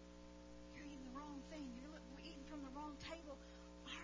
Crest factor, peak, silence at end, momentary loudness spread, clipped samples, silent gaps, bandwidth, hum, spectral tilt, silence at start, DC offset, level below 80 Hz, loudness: 16 dB; -38 dBFS; 0 s; 8 LU; under 0.1%; none; 7.6 kHz; 60 Hz at -60 dBFS; -4.5 dB/octave; 0 s; under 0.1%; -64 dBFS; -55 LUFS